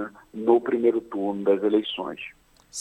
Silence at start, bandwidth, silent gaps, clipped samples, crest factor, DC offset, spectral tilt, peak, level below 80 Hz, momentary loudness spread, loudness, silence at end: 0 s; 8.4 kHz; none; under 0.1%; 18 dB; under 0.1%; -5 dB/octave; -6 dBFS; -66 dBFS; 16 LU; -24 LUFS; 0 s